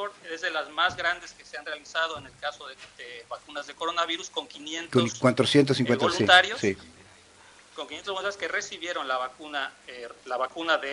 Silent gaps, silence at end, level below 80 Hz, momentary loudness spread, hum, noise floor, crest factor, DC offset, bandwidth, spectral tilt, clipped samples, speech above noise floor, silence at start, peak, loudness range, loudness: none; 0 s; -64 dBFS; 19 LU; none; -54 dBFS; 22 dB; under 0.1%; 11 kHz; -4 dB/octave; under 0.1%; 26 dB; 0 s; -6 dBFS; 10 LU; -26 LUFS